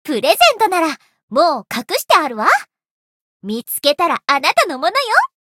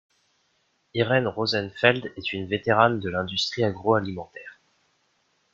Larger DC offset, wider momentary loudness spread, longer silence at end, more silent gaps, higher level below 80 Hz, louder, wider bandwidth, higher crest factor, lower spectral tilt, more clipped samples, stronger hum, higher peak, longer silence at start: neither; second, 11 LU vs 14 LU; second, 0.2 s vs 1 s; first, 1.23-1.28 s, 2.91-3.40 s vs none; about the same, -62 dBFS vs -62 dBFS; first, -15 LUFS vs -24 LUFS; first, 17 kHz vs 7.6 kHz; second, 16 dB vs 24 dB; second, -2 dB/octave vs -5.5 dB/octave; neither; neither; about the same, 0 dBFS vs -2 dBFS; second, 0.05 s vs 0.95 s